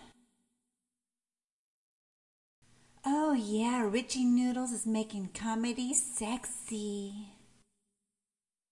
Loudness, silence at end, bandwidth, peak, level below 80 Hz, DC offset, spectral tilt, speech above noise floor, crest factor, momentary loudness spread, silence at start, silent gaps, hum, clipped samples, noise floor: -33 LUFS; 1.4 s; 11.5 kHz; -14 dBFS; -68 dBFS; under 0.1%; -3.5 dB/octave; over 57 dB; 22 dB; 10 LU; 0 s; 1.44-2.62 s; none; under 0.1%; under -90 dBFS